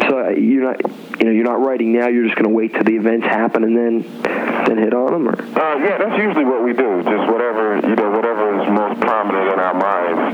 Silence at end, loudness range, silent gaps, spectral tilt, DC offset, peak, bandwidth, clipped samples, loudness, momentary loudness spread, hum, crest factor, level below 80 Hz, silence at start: 0 s; 1 LU; none; -7.5 dB/octave; under 0.1%; -2 dBFS; 6.6 kHz; under 0.1%; -16 LUFS; 4 LU; none; 14 dB; -70 dBFS; 0 s